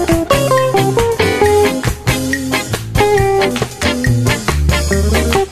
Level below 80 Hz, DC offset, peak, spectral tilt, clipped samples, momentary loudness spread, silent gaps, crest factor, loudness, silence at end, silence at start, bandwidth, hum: -22 dBFS; under 0.1%; 0 dBFS; -5 dB/octave; under 0.1%; 5 LU; none; 14 dB; -14 LUFS; 0 s; 0 s; 14 kHz; none